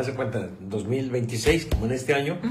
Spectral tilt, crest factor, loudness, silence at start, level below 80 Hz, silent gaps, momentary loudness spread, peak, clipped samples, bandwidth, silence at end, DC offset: -5.5 dB/octave; 16 dB; -26 LUFS; 0 s; -36 dBFS; none; 9 LU; -8 dBFS; under 0.1%; 16 kHz; 0 s; under 0.1%